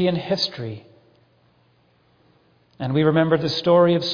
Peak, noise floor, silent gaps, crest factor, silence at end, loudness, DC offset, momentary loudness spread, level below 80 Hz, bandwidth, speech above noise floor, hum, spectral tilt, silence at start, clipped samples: -4 dBFS; -60 dBFS; none; 18 dB; 0 s; -20 LUFS; under 0.1%; 17 LU; -60 dBFS; 5.4 kHz; 41 dB; none; -7 dB/octave; 0 s; under 0.1%